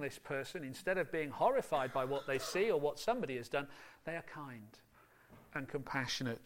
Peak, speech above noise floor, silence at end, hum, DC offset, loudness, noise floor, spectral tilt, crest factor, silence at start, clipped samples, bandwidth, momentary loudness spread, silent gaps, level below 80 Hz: -20 dBFS; 25 dB; 0 s; none; under 0.1%; -38 LUFS; -63 dBFS; -4.5 dB/octave; 20 dB; 0 s; under 0.1%; 16.5 kHz; 14 LU; none; -68 dBFS